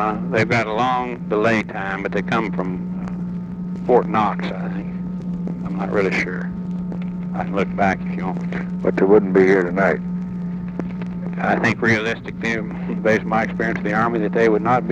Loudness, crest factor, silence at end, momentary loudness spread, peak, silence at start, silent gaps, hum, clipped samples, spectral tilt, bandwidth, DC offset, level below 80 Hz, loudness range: -20 LUFS; 18 dB; 0 s; 11 LU; -2 dBFS; 0 s; none; none; under 0.1%; -7.5 dB/octave; 8 kHz; under 0.1%; -46 dBFS; 4 LU